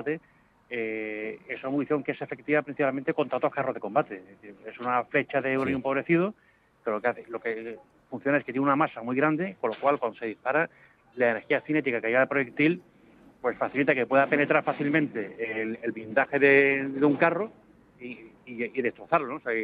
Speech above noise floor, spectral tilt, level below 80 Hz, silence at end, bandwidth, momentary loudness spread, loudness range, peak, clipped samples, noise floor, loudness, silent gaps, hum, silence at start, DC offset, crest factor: 29 dB; -9 dB/octave; -72 dBFS; 0 s; 4.9 kHz; 13 LU; 5 LU; -6 dBFS; under 0.1%; -56 dBFS; -27 LUFS; none; none; 0 s; under 0.1%; 20 dB